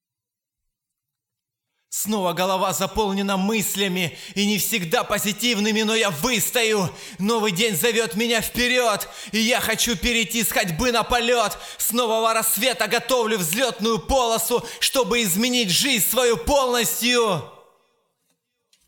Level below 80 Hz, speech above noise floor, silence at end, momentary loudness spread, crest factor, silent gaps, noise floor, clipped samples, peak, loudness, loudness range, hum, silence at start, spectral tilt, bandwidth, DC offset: -44 dBFS; 65 dB; 1.35 s; 5 LU; 18 dB; none; -87 dBFS; under 0.1%; -4 dBFS; -20 LUFS; 3 LU; none; 1.9 s; -2.5 dB/octave; 20 kHz; under 0.1%